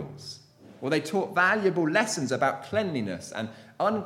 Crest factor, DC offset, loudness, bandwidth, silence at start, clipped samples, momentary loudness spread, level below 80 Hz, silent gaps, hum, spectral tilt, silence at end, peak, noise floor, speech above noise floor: 18 dB; under 0.1%; -27 LUFS; 15.5 kHz; 0 s; under 0.1%; 16 LU; -70 dBFS; none; none; -4.5 dB/octave; 0 s; -8 dBFS; -51 dBFS; 24 dB